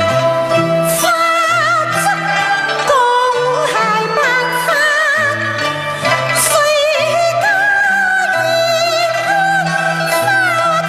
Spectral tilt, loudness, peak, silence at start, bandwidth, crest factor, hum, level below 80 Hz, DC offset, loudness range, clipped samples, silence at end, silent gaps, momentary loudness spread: -2.5 dB/octave; -13 LUFS; 0 dBFS; 0 s; 15 kHz; 14 dB; none; -54 dBFS; under 0.1%; 1 LU; under 0.1%; 0 s; none; 3 LU